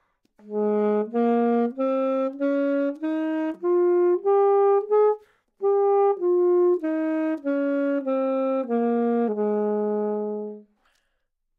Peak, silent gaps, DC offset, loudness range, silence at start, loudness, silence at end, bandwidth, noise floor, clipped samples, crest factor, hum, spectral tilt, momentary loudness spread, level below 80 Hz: -12 dBFS; none; under 0.1%; 4 LU; 0.45 s; -23 LUFS; 0.95 s; 4.1 kHz; -74 dBFS; under 0.1%; 12 dB; none; -9.5 dB/octave; 7 LU; -80 dBFS